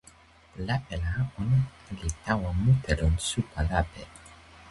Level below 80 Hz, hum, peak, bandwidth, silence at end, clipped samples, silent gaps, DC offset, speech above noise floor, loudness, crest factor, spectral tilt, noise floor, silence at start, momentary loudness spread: -36 dBFS; none; -10 dBFS; 11.5 kHz; 0 s; under 0.1%; none; under 0.1%; 28 dB; -29 LUFS; 20 dB; -5.5 dB/octave; -55 dBFS; 0.55 s; 15 LU